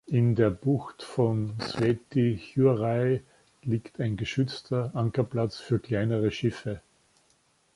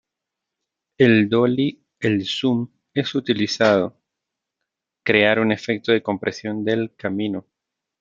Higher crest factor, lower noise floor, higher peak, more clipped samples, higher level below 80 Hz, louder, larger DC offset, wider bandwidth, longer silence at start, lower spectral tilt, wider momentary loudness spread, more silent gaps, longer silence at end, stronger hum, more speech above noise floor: about the same, 18 dB vs 20 dB; second, -67 dBFS vs -84 dBFS; second, -10 dBFS vs 0 dBFS; neither; first, -56 dBFS vs -64 dBFS; second, -28 LUFS vs -20 LUFS; neither; first, 11.5 kHz vs 7.6 kHz; second, 0.1 s vs 1 s; first, -8 dB/octave vs -6 dB/octave; about the same, 8 LU vs 10 LU; neither; first, 0.95 s vs 0.6 s; neither; second, 40 dB vs 64 dB